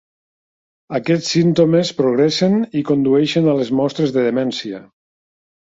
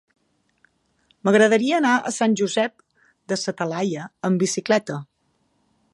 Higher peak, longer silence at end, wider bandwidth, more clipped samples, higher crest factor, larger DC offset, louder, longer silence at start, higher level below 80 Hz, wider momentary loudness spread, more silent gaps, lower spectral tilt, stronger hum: about the same, -2 dBFS vs -4 dBFS; about the same, 0.95 s vs 0.9 s; second, 8 kHz vs 11.5 kHz; neither; about the same, 16 dB vs 20 dB; neither; first, -16 LUFS vs -21 LUFS; second, 0.9 s vs 1.25 s; first, -58 dBFS vs -72 dBFS; about the same, 9 LU vs 11 LU; neither; first, -6 dB/octave vs -4.5 dB/octave; neither